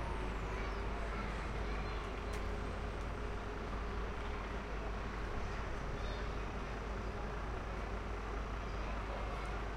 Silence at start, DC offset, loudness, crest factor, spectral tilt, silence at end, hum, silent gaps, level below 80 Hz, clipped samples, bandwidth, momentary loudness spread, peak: 0 s; under 0.1%; -43 LUFS; 12 dB; -6 dB/octave; 0 s; none; none; -44 dBFS; under 0.1%; 10 kHz; 2 LU; -28 dBFS